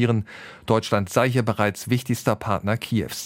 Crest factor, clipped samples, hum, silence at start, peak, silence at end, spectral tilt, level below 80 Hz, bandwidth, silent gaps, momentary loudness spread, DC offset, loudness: 18 dB; under 0.1%; none; 0 s; -4 dBFS; 0 s; -6 dB/octave; -54 dBFS; 16.5 kHz; none; 5 LU; under 0.1%; -23 LUFS